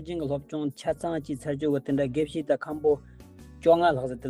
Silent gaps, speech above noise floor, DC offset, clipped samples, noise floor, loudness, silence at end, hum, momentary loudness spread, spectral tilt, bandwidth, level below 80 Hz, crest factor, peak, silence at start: none; 21 dB; under 0.1%; under 0.1%; -47 dBFS; -27 LUFS; 0 s; none; 10 LU; -7 dB/octave; 15.5 kHz; -54 dBFS; 18 dB; -10 dBFS; 0 s